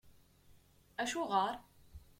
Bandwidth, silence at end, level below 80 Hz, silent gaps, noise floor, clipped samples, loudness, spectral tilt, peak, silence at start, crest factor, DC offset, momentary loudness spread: 16.5 kHz; 0.2 s; -66 dBFS; none; -65 dBFS; under 0.1%; -37 LUFS; -3 dB/octave; -20 dBFS; 0.05 s; 22 dB; under 0.1%; 15 LU